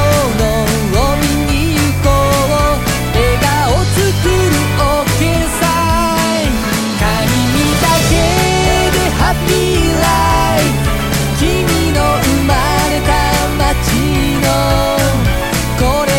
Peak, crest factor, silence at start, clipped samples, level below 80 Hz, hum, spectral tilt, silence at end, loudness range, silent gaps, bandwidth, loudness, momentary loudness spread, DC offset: 0 dBFS; 12 dB; 0 s; under 0.1%; -20 dBFS; none; -4.5 dB/octave; 0 s; 1 LU; none; 17 kHz; -13 LUFS; 3 LU; under 0.1%